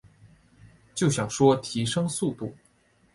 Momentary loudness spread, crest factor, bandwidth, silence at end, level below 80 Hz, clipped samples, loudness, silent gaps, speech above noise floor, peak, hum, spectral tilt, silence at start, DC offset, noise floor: 16 LU; 20 dB; 11.5 kHz; 0.6 s; -58 dBFS; under 0.1%; -25 LUFS; none; 38 dB; -8 dBFS; none; -5 dB/octave; 0.25 s; under 0.1%; -63 dBFS